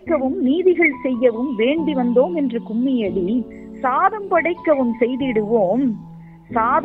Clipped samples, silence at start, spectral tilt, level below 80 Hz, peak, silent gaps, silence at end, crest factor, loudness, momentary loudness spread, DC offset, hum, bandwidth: under 0.1%; 0.05 s; -9 dB/octave; -52 dBFS; -2 dBFS; none; 0 s; 16 dB; -19 LUFS; 6 LU; under 0.1%; none; 4.1 kHz